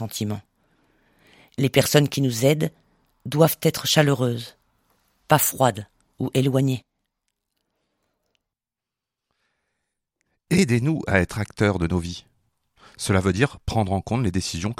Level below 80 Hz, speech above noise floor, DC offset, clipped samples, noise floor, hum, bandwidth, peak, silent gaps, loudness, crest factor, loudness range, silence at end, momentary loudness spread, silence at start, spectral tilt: -48 dBFS; 67 dB; under 0.1%; under 0.1%; -88 dBFS; none; 16.5 kHz; 0 dBFS; none; -22 LUFS; 24 dB; 8 LU; 0.05 s; 13 LU; 0 s; -5 dB/octave